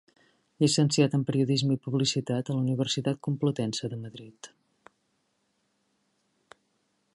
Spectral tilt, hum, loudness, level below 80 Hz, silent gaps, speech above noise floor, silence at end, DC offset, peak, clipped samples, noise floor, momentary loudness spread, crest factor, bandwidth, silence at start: -5.5 dB/octave; none; -27 LUFS; -70 dBFS; none; 47 dB; 2.7 s; under 0.1%; -10 dBFS; under 0.1%; -75 dBFS; 13 LU; 20 dB; 11.5 kHz; 0.6 s